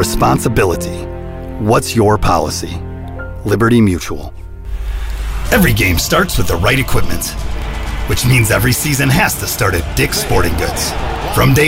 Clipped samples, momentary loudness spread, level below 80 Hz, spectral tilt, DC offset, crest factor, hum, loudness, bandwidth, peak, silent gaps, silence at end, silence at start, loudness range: under 0.1%; 14 LU; -22 dBFS; -4.5 dB/octave; under 0.1%; 14 dB; none; -14 LUFS; 16.5 kHz; 0 dBFS; none; 0 s; 0 s; 3 LU